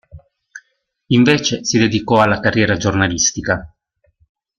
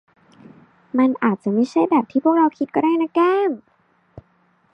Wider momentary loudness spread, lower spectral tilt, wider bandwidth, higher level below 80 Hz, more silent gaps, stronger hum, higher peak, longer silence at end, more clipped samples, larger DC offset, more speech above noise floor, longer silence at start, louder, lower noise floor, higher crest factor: about the same, 6 LU vs 4 LU; second, -4 dB/octave vs -7.5 dB/octave; first, 10 kHz vs 8.2 kHz; first, -44 dBFS vs -64 dBFS; neither; neither; first, 0 dBFS vs -4 dBFS; second, 0.9 s vs 1.15 s; neither; neither; first, 50 dB vs 43 dB; second, 0.15 s vs 0.95 s; first, -15 LUFS vs -19 LUFS; first, -65 dBFS vs -61 dBFS; about the same, 16 dB vs 18 dB